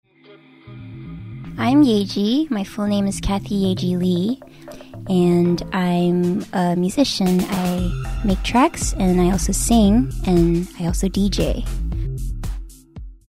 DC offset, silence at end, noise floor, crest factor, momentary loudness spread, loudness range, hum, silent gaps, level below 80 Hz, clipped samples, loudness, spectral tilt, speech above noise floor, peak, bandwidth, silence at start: under 0.1%; 0.15 s; -48 dBFS; 16 dB; 19 LU; 3 LU; none; none; -30 dBFS; under 0.1%; -19 LUFS; -6 dB/octave; 30 dB; -2 dBFS; 16 kHz; 0.3 s